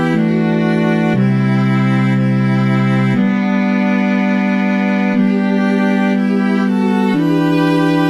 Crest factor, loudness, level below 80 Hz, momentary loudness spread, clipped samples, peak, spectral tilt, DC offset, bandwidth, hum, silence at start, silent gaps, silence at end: 10 dB; -14 LUFS; -60 dBFS; 1 LU; under 0.1%; -2 dBFS; -8 dB/octave; 0.3%; 9.8 kHz; none; 0 s; none; 0 s